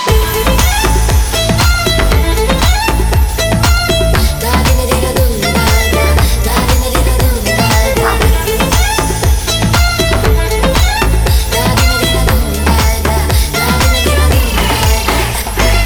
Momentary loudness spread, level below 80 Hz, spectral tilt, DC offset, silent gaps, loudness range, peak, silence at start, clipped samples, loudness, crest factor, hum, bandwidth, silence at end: 2 LU; -14 dBFS; -4 dB/octave; under 0.1%; none; 0 LU; 0 dBFS; 0 s; under 0.1%; -11 LUFS; 10 dB; none; over 20 kHz; 0 s